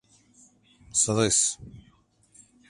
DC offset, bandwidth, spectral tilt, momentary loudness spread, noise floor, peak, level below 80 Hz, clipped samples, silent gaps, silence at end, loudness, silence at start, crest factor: under 0.1%; 11.5 kHz; -2.5 dB/octave; 8 LU; -62 dBFS; -10 dBFS; -58 dBFS; under 0.1%; none; 0.9 s; -23 LUFS; 0.95 s; 20 dB